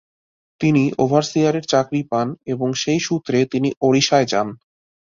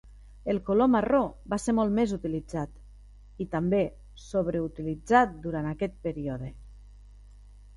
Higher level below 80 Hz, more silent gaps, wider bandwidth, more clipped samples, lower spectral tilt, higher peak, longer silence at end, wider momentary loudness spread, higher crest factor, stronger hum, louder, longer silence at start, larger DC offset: second, -58 dBFS vs -48 dBFS; first, 3.77-3.81 s vs none; second, 7.6 kHz vs 11.5 kHz; neither; second, -5 dB/octave vs -7 dB/octave; first, -2 dBFS vs -6 dBFS; first, 0.6 s vs 0.3 s; second, 6 LU vs 12 LU; about the same, 18 dB vs 22 dB; second, none vs 50 Hz at -45 dBFS; first, -19 LUFS vs -28 LUFS; first, 0.6 s vs 0.05 s; neither